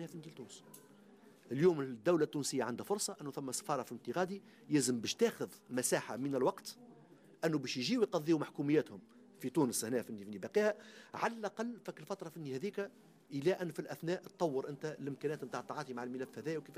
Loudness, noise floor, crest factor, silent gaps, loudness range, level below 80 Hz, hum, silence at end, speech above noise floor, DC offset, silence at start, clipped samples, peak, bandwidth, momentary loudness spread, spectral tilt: -37 LUFS; -62 dBFS; 18 dB; none; 4 LU; -84 dBFS; none; 0 s; 24 dB; under 0.1%; 0 s; under 0.1%; -20 dBFS; 15.5 kHz; 14 LU; -4.5 dB/octave